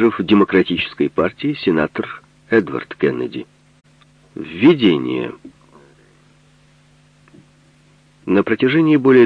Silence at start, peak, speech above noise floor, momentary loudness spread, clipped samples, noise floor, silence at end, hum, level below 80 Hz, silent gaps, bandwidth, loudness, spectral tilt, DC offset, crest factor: 0 s; 0 dBFS; 36 dB; 18 LU; under 0.1%; -52 dBFS; 0 s; none; -54 dBFS; none; 6 kHz; -17 LUFS; -8 dB/octave; under 0.1%; 18 dB